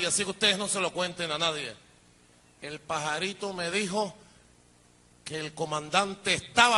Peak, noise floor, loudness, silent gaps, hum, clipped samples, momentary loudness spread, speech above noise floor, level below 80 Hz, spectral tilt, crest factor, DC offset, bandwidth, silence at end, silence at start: -4 dBFS; -60 dBFS; -29 LUFS; none; none; under 0.1%; 14 LU; 31 dB; -64 dBFS; -2 dB/octave; 26 dB; under 0.1%; 11.5 kHz; 0 s; 0 s